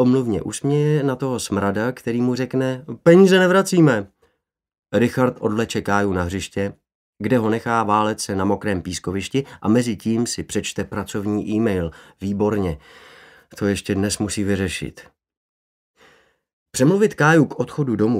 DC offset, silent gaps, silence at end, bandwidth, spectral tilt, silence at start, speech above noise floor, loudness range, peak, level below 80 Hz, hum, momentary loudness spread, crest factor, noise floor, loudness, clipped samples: under 0.1%; 4.79-4.83 s, 6.95-7.13 s, 15.37-15.94 s, 16.53-16.66 s; 0 s; 16 kHz; -5.5 dB/octave; 0 s; 52 dB; 7 LU; 0 dBFS; -50 dBFS; none; 11 LU; 20 dB; -71 dBFS; -20 LUFS; under 0.1%